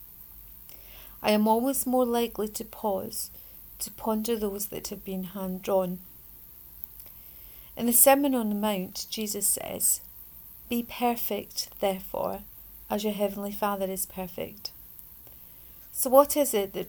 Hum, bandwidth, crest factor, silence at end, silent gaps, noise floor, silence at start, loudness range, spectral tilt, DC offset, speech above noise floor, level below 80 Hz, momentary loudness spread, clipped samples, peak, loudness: none; over 20 kHz; 26 dB; 0 s; none; -49 dBFS; 0 s; 8 LU; -3.5 dB/octave; under 0.1%; 21 dB; -56 dBFS; 21 LU; under 0.1%; -4 dBFS; -27 LUFS